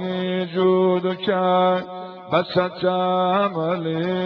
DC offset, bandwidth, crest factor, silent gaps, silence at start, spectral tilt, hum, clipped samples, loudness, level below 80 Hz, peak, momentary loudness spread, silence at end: under 0.1%; 5.4 kHz; 16 dB; none; 0 s; -9 dB/octave; none; under 0.1%; -21 LUFS; -64 dBFS; -6 dBFS; 6 LU; 0 s